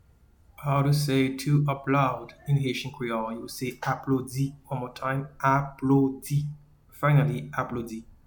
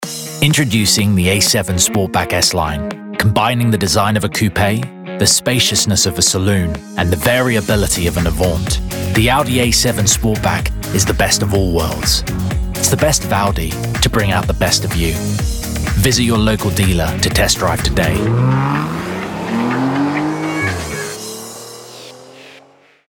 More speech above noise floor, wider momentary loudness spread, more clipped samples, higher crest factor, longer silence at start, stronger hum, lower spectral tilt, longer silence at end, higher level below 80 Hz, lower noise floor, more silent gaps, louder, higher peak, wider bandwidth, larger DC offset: about the same, 32 dB vs 32 dB; about the same, 11 LU vs 9 LU; neither; about the same, 18 dB vs 14 dB; first, 0.6 s vs 0 s; neither; first, -7 dB/octave vs -4 dB/octave; second, 0.15 s vs 0.5 s; second, -56 dBFS vs -26 dBFS; first, -58 dBFS vs -47 dBFS; neither; second, -27 LUFS vs -15 LUFS; second, -10 dBFS vs 0 dBFS; about the same, 19 kHz vs over 20 kHz; neither